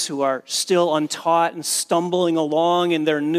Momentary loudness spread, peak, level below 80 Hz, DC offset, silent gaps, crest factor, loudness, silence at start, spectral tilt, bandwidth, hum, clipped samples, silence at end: 3 LU; -6 dBFS; -78 dBFS; under 0.1%; none; 14 dB; -20 LUFS; 0 s; -3.5 dB/octave; 16 kHz; none; under 0.1%; 0 s